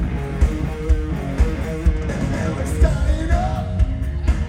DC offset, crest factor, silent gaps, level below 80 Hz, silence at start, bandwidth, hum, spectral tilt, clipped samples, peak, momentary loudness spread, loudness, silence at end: under 0.1%; 16 dB; none; -20 dBFS; 0 s; 11 kHz; none; -7 dB/octave; under 0.1%; -4 dBFS; 4 LU; -22 LUFS; 0 s